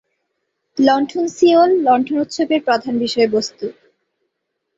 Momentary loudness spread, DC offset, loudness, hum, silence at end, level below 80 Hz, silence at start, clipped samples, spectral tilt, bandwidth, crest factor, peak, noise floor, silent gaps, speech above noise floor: 12 LU; under 0.1%; -16 LUFS; none; 1.05 s; -62 dBFS; 0.75 s; under 0.1%; -4.5 dB/octave; 7.8 kHz; 16 dB; 0 dBFS; -75 dBFS; none; 59 dB